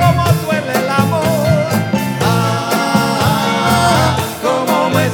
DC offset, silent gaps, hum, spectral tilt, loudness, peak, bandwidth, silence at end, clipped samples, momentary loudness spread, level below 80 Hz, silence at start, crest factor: under 0.1%; none; none; -5.5 dB/octave; -14 LUFS; 0 dBFS; 19.5 kHz; 0 s; under 0.1%; 4 LU; -44 dBFS; 0 s; 14 dB